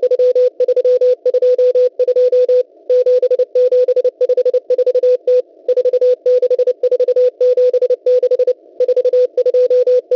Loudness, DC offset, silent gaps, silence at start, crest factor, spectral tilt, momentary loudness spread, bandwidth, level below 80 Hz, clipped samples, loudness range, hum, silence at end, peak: -13 LUFS; under 0.1%; none; 0 s; 6 dB; -4 dB/octave; 3 LU; 6 kHz; -66 dBFS; under 0.1%; 1 LU; none; 0 s; -6 dBFS